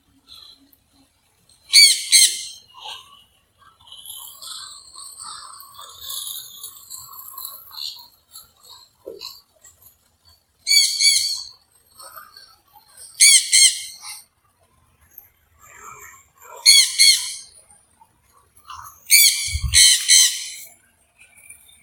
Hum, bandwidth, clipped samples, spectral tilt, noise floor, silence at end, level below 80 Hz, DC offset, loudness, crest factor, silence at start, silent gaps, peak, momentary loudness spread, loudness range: none; 17.5 kHz; under 0.1%; 3 dB/octave; -62 dBFS; 1.2 s; -46 dBFS; under 0.1%; -12 LUFS; 22 dB; 1.7 s; none; 0 dBFS; 26 LU; 20 LU